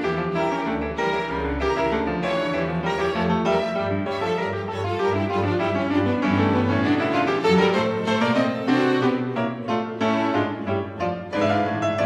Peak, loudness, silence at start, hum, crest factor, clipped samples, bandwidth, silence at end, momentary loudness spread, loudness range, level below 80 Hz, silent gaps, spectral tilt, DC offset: -6 dBFS; -23 LUFS; 0 s; none; 16 dB; under 0.1%; 11.5 kHz; 0 s; 6 LU; 3 LU; -44 dBFS; none; -6.5 dB/octave; under 0.1%